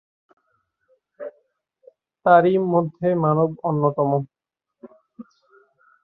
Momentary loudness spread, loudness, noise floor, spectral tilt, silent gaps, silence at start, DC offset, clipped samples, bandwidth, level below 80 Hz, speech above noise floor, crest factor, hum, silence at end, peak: 23 LU; -20 LUFS; -80 dBFS; -11 dB/octave; none; 1.2 s; under 0.1%; under 0.1%; 4.2 kHz; -68 dBFS; 61 dB; 22 dB; none; 0.8 s; -2 dBFS